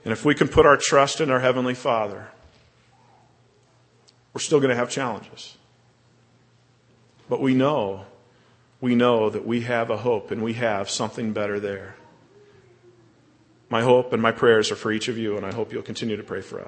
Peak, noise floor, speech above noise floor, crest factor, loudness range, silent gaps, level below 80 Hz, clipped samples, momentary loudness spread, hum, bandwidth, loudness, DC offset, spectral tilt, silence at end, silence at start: -2 dBFS; -59 dBFS; 37 dB; 22 dB; 5 LU; none; -52 dBFS; under 0.1%; 13 LU; none; 8.8 kHz; -22 LUFS; under 0.1%; -4.5 dB/octave; 0 s; 0.05 s